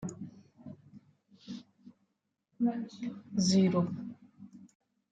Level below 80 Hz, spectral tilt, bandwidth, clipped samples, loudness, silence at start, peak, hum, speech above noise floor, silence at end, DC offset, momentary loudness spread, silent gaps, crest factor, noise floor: -74 dBFS; -6 dB/octave; 9.2 kHz; under 0.1%; -32 LUFS; 0 s; -16 dBFS; none; 51 dB; 0.45 s; under 0.1%; 27 LU; none; 20 dB; -81 dBFS